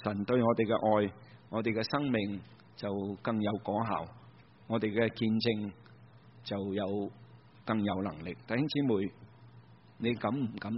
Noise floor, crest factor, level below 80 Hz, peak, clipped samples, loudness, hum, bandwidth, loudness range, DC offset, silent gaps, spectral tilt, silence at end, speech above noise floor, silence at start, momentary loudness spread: -57 dBFS; 20 dB; -66 dBFS; -14 dBFS; under 0.1%; -33 LUFS; none; 5.8 kHz; 3 LU; under 0.1%; none; -5.5 dB/octave; 0 s; 25 dB; 0 s; 12 LU